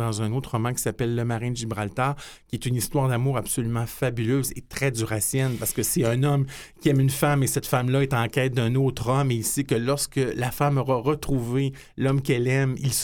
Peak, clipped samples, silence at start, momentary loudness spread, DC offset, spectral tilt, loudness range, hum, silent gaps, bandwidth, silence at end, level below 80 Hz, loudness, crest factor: -6 dBFS; under 0.1%; 0 s; 6 LU; under 0.1%; -5.5 dB/octave; 3 LU; none; none; 18.5 kHz; 0 s; -46 dBFS; -25 LUFS; 18 dB